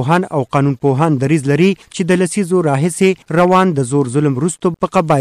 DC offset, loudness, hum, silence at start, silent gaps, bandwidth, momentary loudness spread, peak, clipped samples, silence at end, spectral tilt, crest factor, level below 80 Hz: under 0.1%; -14 LUFS; none; 0 s; none; 13 kHz; 4 LU; -2 dBFS; under 0.1%; 0 s; -6.5 dB/octave; 10 dB; -50 dBFS